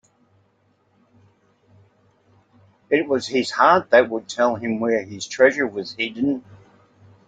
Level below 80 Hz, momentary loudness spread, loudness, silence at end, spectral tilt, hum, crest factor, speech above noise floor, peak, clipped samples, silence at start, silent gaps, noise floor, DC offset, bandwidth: -68 dBFS; 10 LU; -20 LUFS; 0.75 s; -4.5 dB/octave; none; 22 dB; 44 dB; -2 dBFS; under 0.1%; 2.9 s; none; -63 dBFS; under 0.1%; 9.2 kHz